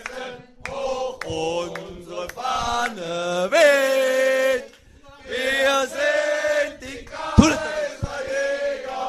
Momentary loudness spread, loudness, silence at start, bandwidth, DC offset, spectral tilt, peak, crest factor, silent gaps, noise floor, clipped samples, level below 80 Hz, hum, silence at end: 16 LU; -22 LUFS; 0 s; 14 kHz; under 0.1%; -4.5 dB/octave; 0 dBFS; 22 dB; none; -48 dBFS; under 0.1%; -38 dBFS; none; 0 s